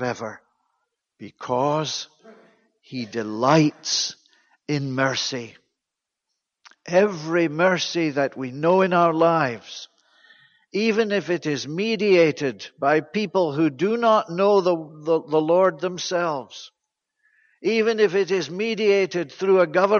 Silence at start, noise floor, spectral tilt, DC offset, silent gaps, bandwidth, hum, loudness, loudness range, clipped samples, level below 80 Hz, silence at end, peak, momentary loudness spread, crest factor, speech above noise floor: 0 s; -85 dBFS; -5 dB/octave; under 0.1%; none; 7.2 kHz; none; -22 LUFS; 4 LU; under 0.1%; -70 dBFS; 0 s; -6 dBFS; 13 LU; 16 dB; 64 dB